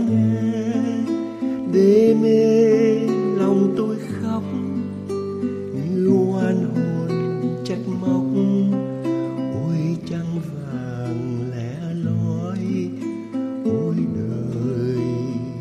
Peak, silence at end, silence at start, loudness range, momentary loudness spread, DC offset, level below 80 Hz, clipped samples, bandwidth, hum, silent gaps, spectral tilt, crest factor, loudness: -4 dBFS; 0 s; 0 s; 8 LU; 12 LU; under 0.1%; -58 dBFS; under 0.1%; 11.5 kHz; none; none; -8.5 dB/octave; 16 dB; -21 LUFS